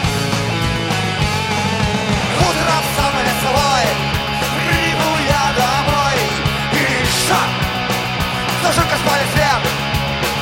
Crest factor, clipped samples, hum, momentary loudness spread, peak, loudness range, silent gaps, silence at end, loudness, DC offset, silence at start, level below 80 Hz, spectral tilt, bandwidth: 16 dB; under 0.1%; none; 4 LU; 0 dBFS; 1 LU; none; 0 s; -16 LUFS; under 0.1%; 0 s; -32 dBFS; -4 dB/octave; 17 kHz